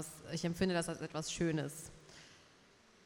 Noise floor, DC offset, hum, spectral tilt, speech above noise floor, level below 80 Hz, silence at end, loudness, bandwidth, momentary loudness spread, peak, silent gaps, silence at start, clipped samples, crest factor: -65 dBFS; under 0.1%; none; -5 dB/octave; 27 dB; -64 dBFS; 0.6 s; -38 LUFS; 17 kHz; 21 LU; -20 dBFS; none; 0 s; under 0.1%; 20 dB